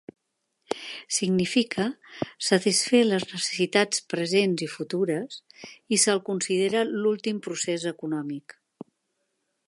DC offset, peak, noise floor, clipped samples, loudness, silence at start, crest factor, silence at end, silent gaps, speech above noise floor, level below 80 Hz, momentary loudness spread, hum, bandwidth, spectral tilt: under 0.1%; -6 dBFS; -78 dBFS; under 0.1%; -25 LUFS; 0.7 s; 20 dB; 1.25 s; none; 52 dB; -72 dBFS; 14 LU; none; 11.5 kHz; -3.5 dB/octave